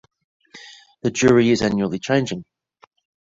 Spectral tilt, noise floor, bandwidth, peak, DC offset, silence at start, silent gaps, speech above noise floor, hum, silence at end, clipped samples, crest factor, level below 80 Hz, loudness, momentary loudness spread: -5.5 dB/octave; -44 dBFS; 7.8 kHz; -4 dBFS; under 0.1%; 0.55 s; none; 26 dB; none; 0.85 s; under 0.1%; 18 dB; -52 dBFS; -19 LUFS; 19 LU